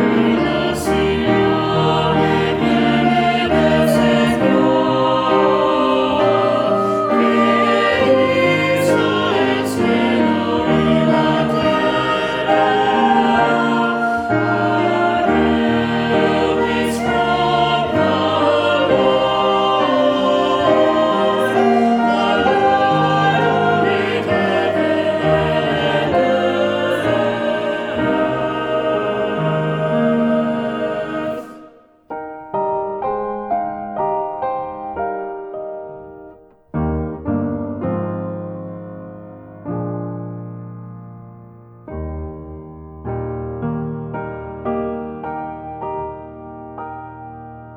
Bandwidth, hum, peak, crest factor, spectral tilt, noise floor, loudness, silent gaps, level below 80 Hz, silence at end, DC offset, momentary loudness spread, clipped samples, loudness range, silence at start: 15.5 kHz; none; -2 dBFS; 14 dB; -6 dB/octave; -44 dBFS; -16 LUFS; none; -42 dBFS; 0 s; under 0.1%; 16 LU; under 0.1%; 12 LU; 0 s